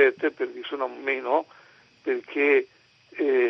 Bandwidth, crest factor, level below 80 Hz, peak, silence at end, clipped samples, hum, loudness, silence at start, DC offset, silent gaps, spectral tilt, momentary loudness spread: 6 kHz; 20 dB; -84 dBFS; -6 dBFS; 0 s; under 0.1%; none; -26 LUFS; 0 s; under 0.1%; none; -5 dB/octave; 16 LU